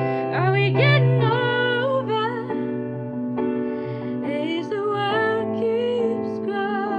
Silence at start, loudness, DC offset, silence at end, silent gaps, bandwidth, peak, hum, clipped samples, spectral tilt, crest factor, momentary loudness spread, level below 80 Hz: 0 s; -22 LUFS; under 0.1%; 0 s; none; 5.2 kHz; -6 dBFS; none; under 0.1%; -8.5 dB/octave; 16 dB; 10 LU; -64 dBFS